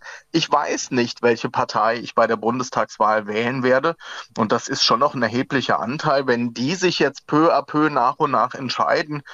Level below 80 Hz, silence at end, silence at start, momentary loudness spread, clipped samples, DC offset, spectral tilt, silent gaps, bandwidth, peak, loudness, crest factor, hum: -64 dBFS; 0 s; 0.05 s; 5 LU; under 0.1%; under 0.1%; -4.5 dB/octave; none; 8 kHz; -6 dBFS; -20 LUFS; 14 dB; none